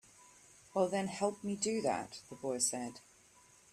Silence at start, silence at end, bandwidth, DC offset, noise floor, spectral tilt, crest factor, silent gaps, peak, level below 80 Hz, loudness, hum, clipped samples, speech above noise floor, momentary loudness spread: 0.25 s; 0.75 s; 14 kHz; under 0.1%; -64 dBFS; -3.5 dB/octave; 20 dB; none; -20 dBFS; -76 dBFS; -36 LUFS; none; under 0.1%; 28 dB; 11 LU